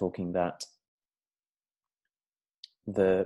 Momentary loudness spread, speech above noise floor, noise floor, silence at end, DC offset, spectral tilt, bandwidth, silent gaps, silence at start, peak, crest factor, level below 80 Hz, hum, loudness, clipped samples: 17 LU; over 61 dB; under -90 dBFS; 0 s; under 0.1%; -6.5 dB/octave; 12 kHz; 0.88-0.98 s, 2.58-2.63 s; 0 s; -12 dBFS; 20 dB; -64 dBFS; none; -31 LUFS; under 0.1%